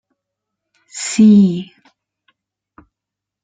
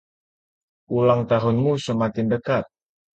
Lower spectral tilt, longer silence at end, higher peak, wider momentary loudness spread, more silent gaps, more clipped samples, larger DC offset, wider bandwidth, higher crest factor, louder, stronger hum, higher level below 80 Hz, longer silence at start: second, -6 dB/octave vs -7.5 dB/octave; first, 1.8 s vs 0.5 s; about the same, -2 dBFS vs -4 dBFS; first, 24 LU vs 6 LU; neither; neither; neither; about the same, 9.4 kHz vs 8.8 kHz; about the same, 16 dB vs 18 dB; first, -13 LUFS vs -22 LUFS; neither; about the same, -60 dBFS vs -56 dBFS; about the same, 0.95 s vs 0.9 s